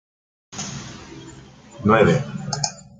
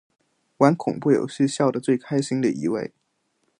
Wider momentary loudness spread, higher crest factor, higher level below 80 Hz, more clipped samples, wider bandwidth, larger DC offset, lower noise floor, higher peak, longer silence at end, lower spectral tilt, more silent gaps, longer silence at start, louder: first, 23 LU vs 7 LU; about the same, 22 dB vs 20 dB; first, -52 dBFS vs -68 dBFS; neither; about the same, 9.6 kHz vs 10.5 kHz; neither; second, -43 dBFS vs -72 dBFS; about the same, -2 dBFS vs -4 dBFS; second, 0.2 s vs 0.7 s; second, -5 dB/octave vs -6.5 dB/octave; neither; about the same, 0.5 s vs 0.6 s; about the same, -21 LUFS vs -22 LUFS